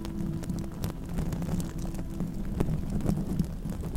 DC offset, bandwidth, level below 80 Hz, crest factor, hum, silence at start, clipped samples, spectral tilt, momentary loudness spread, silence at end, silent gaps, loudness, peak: under 0.1%; 16.5 kHz; -36 dBFS; 22 dB; none; 0 s; under 0.1%; -7.5 dB/octave; 5 LU; 0 s; none; -33 LUFS; -10 dBFS